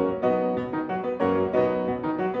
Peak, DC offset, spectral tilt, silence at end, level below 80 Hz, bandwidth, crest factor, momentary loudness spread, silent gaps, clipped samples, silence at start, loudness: -10 dBFS; under 0.1%; -9 dB/octave; 0 s; -56 dBFS; 5.8 kHz; 16 dB; 5 LU; none; under 0.1%; 0 s; -25 LUFS